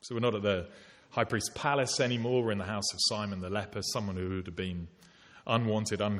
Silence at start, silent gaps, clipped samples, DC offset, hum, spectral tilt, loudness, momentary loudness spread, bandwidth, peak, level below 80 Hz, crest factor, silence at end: 0.05 s; none; under 0.1%; under 0.1%; none; -4 dB/octave; -32 LUFS; 9 LU; 13.5 kHz; -12 dBFS; -62 dBFS; 20 dB; 0 s